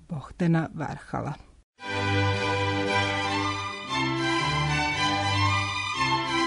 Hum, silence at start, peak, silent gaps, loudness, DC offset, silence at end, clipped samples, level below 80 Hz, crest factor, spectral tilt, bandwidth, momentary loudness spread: none; 0.1 s; -12 dBFS; 1.63-1.73 s; -26 LUFS; under 0.1%; 0 s; under 0.1%; -50 dBFS; 16 dB; -4.5 dB/octave; 10.5 kHz; 9 LU